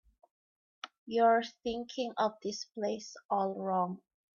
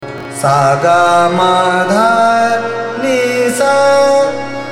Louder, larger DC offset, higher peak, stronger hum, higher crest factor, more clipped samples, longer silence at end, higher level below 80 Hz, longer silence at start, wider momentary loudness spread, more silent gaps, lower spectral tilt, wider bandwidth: second, -33 LUFS vs -11 LUFS; neither; second, -16 dBFS vs 0 dBFS; neither; first, 18 dB vs 12 dB; neither; first, 0.4 s vs 0 s; second, -72 dBFS vs -56 dBFS; first, 0.85 s vs 0 s; first, 18 LU vs 8 LU; first, 0.98-1.06 s, 3.25-3.29 s vs none; about the same, -4.5 dB/octave vs -4.5 dB/octave; second, 7.4 kHz vs 16 kHz